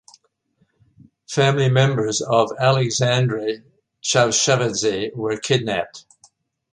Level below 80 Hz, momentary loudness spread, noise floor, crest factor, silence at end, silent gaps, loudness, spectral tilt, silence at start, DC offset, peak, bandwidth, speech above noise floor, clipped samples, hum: -58 dBFS; 10 LU; -66 dBFS; 18 dB; 0.7 s; none; -19 LUFS; -4 dB/octave; 1.3 s; under 0.1%; -2 dBFS; 10.5 kHz; 47 dB; under 0.1%; none